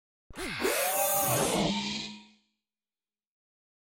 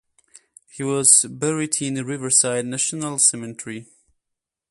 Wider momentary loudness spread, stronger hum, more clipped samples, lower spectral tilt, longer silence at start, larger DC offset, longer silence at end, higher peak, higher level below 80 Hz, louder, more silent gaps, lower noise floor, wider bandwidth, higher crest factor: second, 14 LU vs 19 LU; neither; neither; about the same, -3 dB/octave vs -2.5 dB/octave; second, 0.3 s vs 0.75 s; neither; first, 1.7 s vs 0.85 s; second, -14 dBFS vs 0 dBFS; first, -58 dBFS vs -66 dBFS; second, -28 LUFS vs -18 LUFS; neither; first, under -90 dBFS vs -83 dBFS; first, 17 kHz vs 12 kHz; about the same, 18 dB vs 22 dB